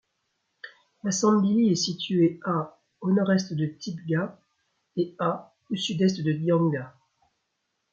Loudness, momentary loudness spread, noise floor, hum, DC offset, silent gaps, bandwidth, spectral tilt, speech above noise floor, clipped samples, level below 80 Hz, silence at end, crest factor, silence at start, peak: -26 LUFS; 14 LU; -78 dBFS; none; under 0.1%; none; 7.8 kHz; -5.5 dB/octave; 54 dB; under 0.1%; -70 dBFS; 1.05 s; 18 dB; 0.65 s; -10 dBFS